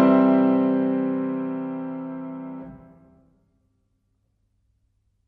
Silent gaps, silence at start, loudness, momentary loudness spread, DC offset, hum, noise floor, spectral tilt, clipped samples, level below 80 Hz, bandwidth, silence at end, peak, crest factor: none; 0 s; -23 LUFS; 19 LU; under 0.1%; none; -70 dBFS; -11 dB/octave; under 0.1%; -64 dBFS; 4.3 kHz; 2.5 s; -6 dBFS; 18 dB